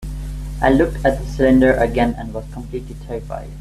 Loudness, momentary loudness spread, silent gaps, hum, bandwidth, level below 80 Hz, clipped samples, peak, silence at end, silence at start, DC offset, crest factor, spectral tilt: -17 LUFS; 16 LU; none; 50 Hz at -25 dBFS; 13.5 kHz; -28 dBFS; under 0.1%; -2 dBFS; 0 s; 0 s; under 0.1%; 16 dB; -7.5 dB/octave